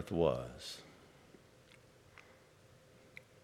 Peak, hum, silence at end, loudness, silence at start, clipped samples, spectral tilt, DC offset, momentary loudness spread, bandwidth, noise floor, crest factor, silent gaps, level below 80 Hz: -18 dBFS; none; 0.2 s; -38 LUFS; 0 s; under 0.1%; -6 dB/octave; under 0.1%; 28 LU; 16 kHz; -64 dBFS; 26 dB; none; -64 dBFS